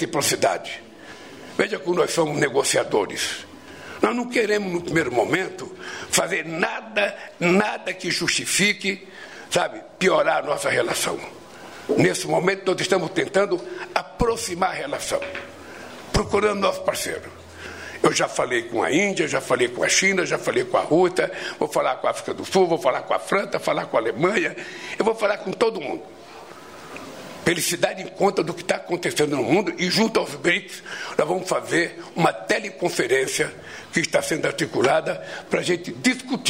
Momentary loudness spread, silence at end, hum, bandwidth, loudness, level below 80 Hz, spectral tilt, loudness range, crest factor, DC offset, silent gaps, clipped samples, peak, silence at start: 15 LU; 0 s; none; 16 kHz; -22 LUFS; -50 dBFS; -3.5 dB/octave; 4 LU; 20 dB; 0.1%; none; under 0.1%; -4 dBFS; 0 s